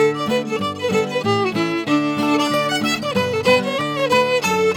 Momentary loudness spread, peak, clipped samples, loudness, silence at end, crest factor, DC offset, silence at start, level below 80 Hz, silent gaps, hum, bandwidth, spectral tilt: 5 LU; -4 dBFS; under 0.1%; -19 LUFS; 0 s; 16 dB; under 0.1%; 0 s; -60 dBFS; none; none; 19 kHz; -4.5 dB/octave